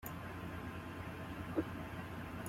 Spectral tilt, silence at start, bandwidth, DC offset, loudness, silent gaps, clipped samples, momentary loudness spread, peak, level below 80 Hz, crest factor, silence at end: -6 dB/octave; 0 s; 16.5 kHz; under 0.1%; -45 LUFS; none; under 0.1%; 5 LU; -26 dBFS; -60 dBFS; 18 dB; 0 s